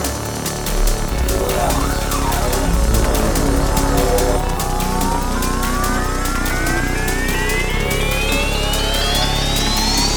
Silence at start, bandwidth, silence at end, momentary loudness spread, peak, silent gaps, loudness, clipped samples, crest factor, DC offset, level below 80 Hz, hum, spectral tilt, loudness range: 0 s; over 20 kHz; 0 s; 4 LU; -2 dBFS; none; -18 LUFS; under 0.1%; 14 dB; under 0.1%; -20 dBFS; none; -3.5 dB/octave; 1 LU